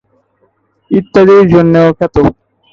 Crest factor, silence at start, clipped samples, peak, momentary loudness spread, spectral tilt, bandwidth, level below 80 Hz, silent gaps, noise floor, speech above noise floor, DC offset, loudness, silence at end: 10 dB; 0.9 s; under 0.1%; 0 dBFS; 9 LU; -9 dB/octave; 7 kHz; -34 dBFS; none; -56 dBFS; 49 dB; under 0.1%; -8 LUFS; 0.4 s